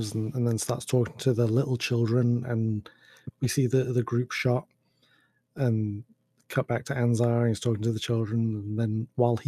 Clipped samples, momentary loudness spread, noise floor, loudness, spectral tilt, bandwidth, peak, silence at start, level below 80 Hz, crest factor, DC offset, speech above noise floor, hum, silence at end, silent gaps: under 0.1%; 7 LU; -67 dBFS; -27 LUFS; -6.5 dB/octave; 13.5 kHz; -10 dBFS; 0 s; -64 dBFS; 18 dB; under 0.1%; 40 dB; none; 0.05 s; none